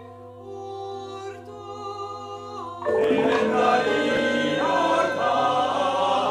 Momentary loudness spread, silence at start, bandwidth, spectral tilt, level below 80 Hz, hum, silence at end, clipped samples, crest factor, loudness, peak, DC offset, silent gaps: 17 LU; 0 s; 12.5 kHz; -4.5 dB/octave; -64 dBFS; none; 0 s; under 0.1%; 16 dB; -22 LUFS; -8 dBFS; under 0.1%; none